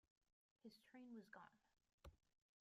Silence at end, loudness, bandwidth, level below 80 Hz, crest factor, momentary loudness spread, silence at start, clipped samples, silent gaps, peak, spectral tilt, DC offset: 0.35 s; -64 LUFS; 13 kHz; -80 dBFS; 18 dB; 6 LU; 0.65 s; under 0.1%; 1.93-1.98 s; -48 dBFS; -5.5 dB/octave; under 0.1%